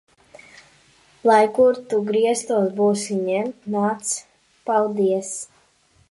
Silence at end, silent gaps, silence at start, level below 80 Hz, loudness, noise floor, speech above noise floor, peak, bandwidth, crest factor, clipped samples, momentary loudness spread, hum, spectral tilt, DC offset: 0.65 s; none; 1.25 s; -68 dBFS; -21 LUFS; -59 dBFS; 39 dB; -4 dBFS; 11.5 kHz; 18 dB; under 0.1%; 11 LU; none; -4.5 dB/octave; under 0.1%